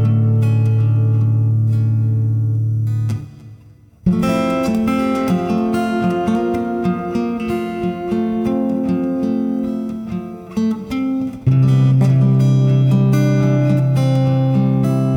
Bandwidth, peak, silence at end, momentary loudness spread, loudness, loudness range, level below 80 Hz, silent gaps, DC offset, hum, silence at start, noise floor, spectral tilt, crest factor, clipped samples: 10 kHz; -4 dBFS; 0 s; 8 LU; -17 LUFS; 6 LU; -44 dBFS; none; under 0.1%; none; 0 s; -44 dBFS; -9 dB/octave; 12 dB; under 0.1%